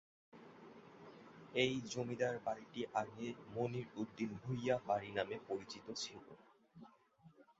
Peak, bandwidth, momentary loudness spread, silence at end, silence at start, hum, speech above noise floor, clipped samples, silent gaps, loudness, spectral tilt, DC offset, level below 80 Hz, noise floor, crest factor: -20 dBFS; 7.6 kHz; 21 LU; 0.15 s; 0.35 s; none; 25 dB; under 0.1%; none; -42 LUFS; -4 dB/octave; under 0.1%; -76 dBFS; -67 dBFS; 24 dB